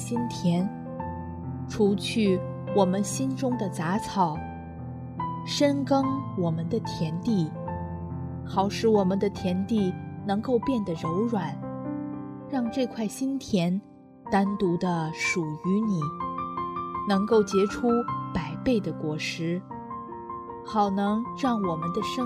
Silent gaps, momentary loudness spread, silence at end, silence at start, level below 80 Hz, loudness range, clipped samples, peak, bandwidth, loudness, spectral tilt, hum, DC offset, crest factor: none; 11 LU; 0 s; 0 s; -56 dBFS; 3 LU; under 0.1%; -8 dBFS; 13.5 kHz; -28 LUFS; -6 dB/octave; none; under 0.1%; 18 dB